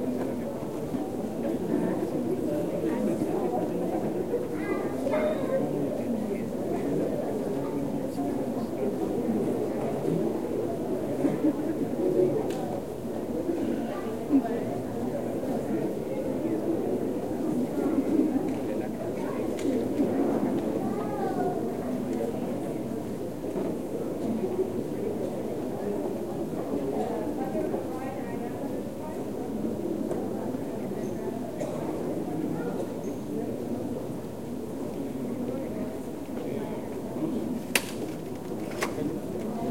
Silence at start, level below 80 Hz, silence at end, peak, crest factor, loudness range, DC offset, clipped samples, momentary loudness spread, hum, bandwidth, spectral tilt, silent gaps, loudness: 0 s; -56 dBFS; 0 s; -6 dBFS; 24 dB; 4 LU; 0.5%; under 0.1%; 7 LU; none; 16.5 kHz; -6.5 dB/octave; none; -30 LUFS